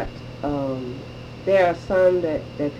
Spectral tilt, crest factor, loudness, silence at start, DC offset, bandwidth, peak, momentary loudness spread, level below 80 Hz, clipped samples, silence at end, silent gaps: -7.5 dB/octave; 16 dB; -22 LUFS; 0 s; under 0.1%; 8.4 kHz; -6 dBFS; 15 LU; -44 dBFS; under 0.1%; 0 s; none